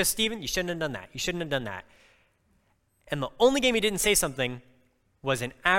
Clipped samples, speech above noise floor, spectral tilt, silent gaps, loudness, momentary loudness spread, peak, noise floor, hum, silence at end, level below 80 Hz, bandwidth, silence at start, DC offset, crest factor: under 0.1%; 42 dB; -2.5 dB/octave; none; -27 LUFS; 13 LU; -6 dBFS; -69 dBFS; none; 0 s; -50 dBFS; 17 kHz; 0 s; under 0.1%; 22 dB